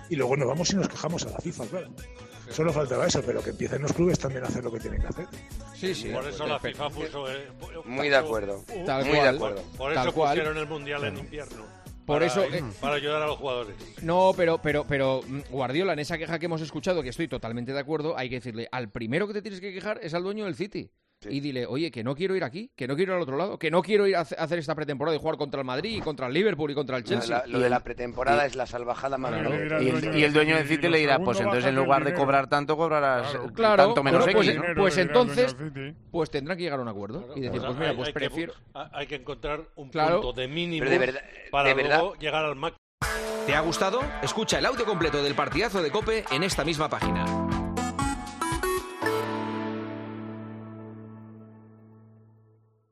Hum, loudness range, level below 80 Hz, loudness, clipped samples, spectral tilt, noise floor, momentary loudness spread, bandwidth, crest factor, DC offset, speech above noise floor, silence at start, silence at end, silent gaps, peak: none; 9 LU; -48 dBFS; -27 LUFS; under 0.1%; -5 dB/octave; -61 dBFS; 14 LU; 13.5 kHz; 22 dB; under 0.1%; 35 dB; 0 s; 1.05 s; 42.78-42.98 s; -6 dBFS